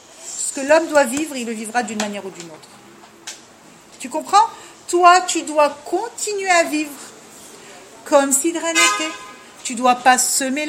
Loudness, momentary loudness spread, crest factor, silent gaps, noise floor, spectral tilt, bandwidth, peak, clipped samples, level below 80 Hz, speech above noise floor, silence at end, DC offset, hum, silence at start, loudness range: -17 LUFS; 22 LU; 18 dB; none; -45 dBFS; -1 dB/octave; 16.5 kHz; 0 dBFS; under 0.1%; -68 dBFS; 28 dB; 0 s; under 0.1%; none; 0.2 s; 6 LU